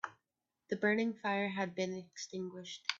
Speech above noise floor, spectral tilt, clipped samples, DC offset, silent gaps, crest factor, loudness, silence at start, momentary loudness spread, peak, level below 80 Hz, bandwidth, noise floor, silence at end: 51 dB; -4.5 dB/octave; under 0.1%; under 0.1%; none; 26 dB; -37 LUFS; 0.05 s; 12 LU; -14 dBFS; -80 dBFS; 7.8 kHz; -89 dBFS; 0 s